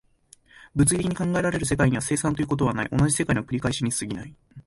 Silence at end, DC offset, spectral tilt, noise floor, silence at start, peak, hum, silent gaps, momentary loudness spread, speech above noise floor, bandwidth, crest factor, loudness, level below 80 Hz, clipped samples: 0.05 s; under 0.1%; -5 dB/octave; -57 dBFS; 0.6 s; -6 dBFS; none; none; 8 LU; 33 dB; 12 kHz; 18 dB; -24 LUFS; -44 dBFS; under 0.1%